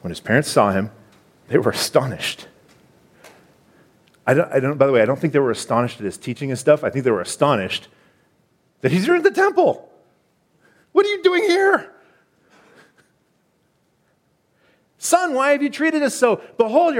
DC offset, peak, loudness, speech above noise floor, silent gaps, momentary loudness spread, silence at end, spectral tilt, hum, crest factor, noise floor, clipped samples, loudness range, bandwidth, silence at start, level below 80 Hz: under 0.1%; -2 dBFS; -19 LUFS; 46 dB; none; 10 LU; 0 s; -5 dB/octave; none; 20 dB; -64 dBFS; under 0.1%; 5 LU; 16.5 kHz; 0.05 s; -62 dBFS